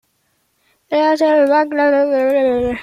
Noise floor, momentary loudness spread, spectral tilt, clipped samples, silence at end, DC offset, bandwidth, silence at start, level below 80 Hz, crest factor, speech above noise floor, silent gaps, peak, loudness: -64 dBFS; 4 LU; -5.5 dB/octave; under 0.1%; 0 s; under 0.1%; 13 kHz; 0.9 s; -48 dBFS; 12 dB; 50 dB; none; -2 dBFS; -14 LUFS